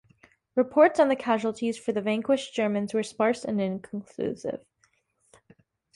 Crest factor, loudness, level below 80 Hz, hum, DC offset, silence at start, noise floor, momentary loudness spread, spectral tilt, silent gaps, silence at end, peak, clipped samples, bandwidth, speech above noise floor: 20 dB; -26 LUFS; -70 dBFS; none; under 0.1%; 0.55 s; -69 dBFS; 14 LU; -5.5 dB/octave; none; 1.4 s; -8 dBFS; under 0.1%; 11.5 kHz; 44 dB